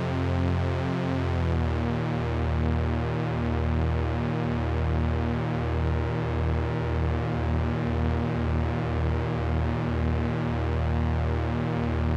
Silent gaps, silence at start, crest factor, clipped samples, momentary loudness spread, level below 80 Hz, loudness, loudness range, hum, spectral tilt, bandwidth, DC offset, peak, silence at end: none; 0 s; 12 dB; under 0.1%; 1 LU; -36 dBFS; -27 LUFS; 0 LU; none; -8.5 dB/octave; 7 kHz; under 0.1%; -14 dBFS; 0 s